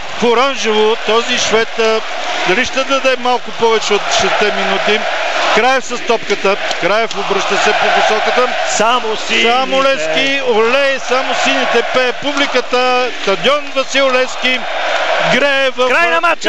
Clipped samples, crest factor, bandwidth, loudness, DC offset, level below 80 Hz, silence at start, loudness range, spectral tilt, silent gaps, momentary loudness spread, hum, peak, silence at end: under 0.1%; 12 dB; 11.5 kHz; -13 LUFS; 7%; -52 dBFS; 0 s; 1 LU; -2 dB/octave; none; 4 LU; none; 0 dBFS; 0 s